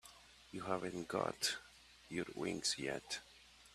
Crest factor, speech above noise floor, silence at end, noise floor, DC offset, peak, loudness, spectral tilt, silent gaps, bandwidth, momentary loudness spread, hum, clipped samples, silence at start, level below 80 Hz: 24 dB; 20 dB; 0 s; -62 dBFS; under 0.1%; -20 dBFS; -42 LUFS; -2.5 dB/octave; none; 14.5 kHz; 22 LU; none; under 0.1%; 0.05 s; -72 dBFS